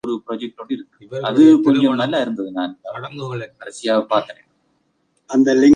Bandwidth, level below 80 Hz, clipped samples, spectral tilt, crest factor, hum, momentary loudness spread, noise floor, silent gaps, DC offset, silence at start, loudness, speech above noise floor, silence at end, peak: 9.6 kHz; -66 dBFS; under 0.1%; -6 dB/octave; 16 dB; none; 18 LU; -66 dBFS; none; under 0.1%; 0.05 s; -18 LUFS; 49 dB; 0 s; -2 dBFS